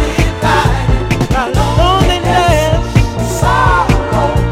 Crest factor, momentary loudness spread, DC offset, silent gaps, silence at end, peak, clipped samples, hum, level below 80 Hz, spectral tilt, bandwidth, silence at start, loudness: 10 dB; 4 LU; under 0.1%; none; 0 s; 0 dBFS; 0.3%; none; -18 dBFS; -5.5 dB/octave; 16 kHz; 0 s; -12 LUFS